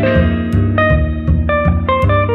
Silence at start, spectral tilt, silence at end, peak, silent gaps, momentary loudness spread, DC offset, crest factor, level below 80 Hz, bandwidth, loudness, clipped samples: 0 s; -9 dB/octave; 0 s; 0 dBFS; none; 2 LU; under 0.1%; 12 dB; -20 dBFS; 4.8 kHz; -14 LUFS; under 0.1%